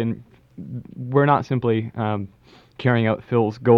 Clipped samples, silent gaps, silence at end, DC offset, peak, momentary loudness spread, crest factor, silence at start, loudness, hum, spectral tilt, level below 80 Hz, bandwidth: under 0.1%; none; 0 s; under 0.1%; -2 dBFS; 17 LU; 18 dB; 0 s; -21 LUFS; none; -9 dB/octave; -58 dBFS; 6.4 kHz